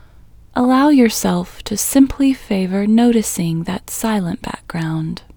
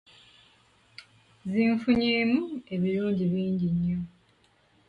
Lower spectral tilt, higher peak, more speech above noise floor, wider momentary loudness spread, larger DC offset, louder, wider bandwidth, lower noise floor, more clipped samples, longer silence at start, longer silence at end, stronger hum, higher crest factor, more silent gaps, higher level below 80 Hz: second, -5 dB/octave vs -8.5 dB/octave; first, 0 dBFS vs -12 dBFS; second, 26 dB vs 38 dB; about the same, 12 LU vs 10 LU; neither; first, -16 LUFS vs -27 LUFS; first, over 20 kHz vs 5.2 kHz; second, -43 dBFS vs -64 dBFS; neither; second, 0.55 s vs 1 s; second, 0.15 s vs 0.8 s; neither; about the same, 16 dB vs 16 dB; neither; first, -42 dBFS vs -58 dBFS